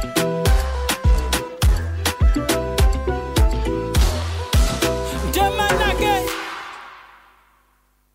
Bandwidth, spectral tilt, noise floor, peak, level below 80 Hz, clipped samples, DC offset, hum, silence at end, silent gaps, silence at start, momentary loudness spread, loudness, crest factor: 16.5 kHz; -4.5 dB/octave; -61 dBFS; -6 dBFS; -22 dBFS; under 0.1%; under 0.1%; 50 Hz at -35 dBFS; 1.1 s; none; 0 s; 7 LU; -20 LUFS; 14 dB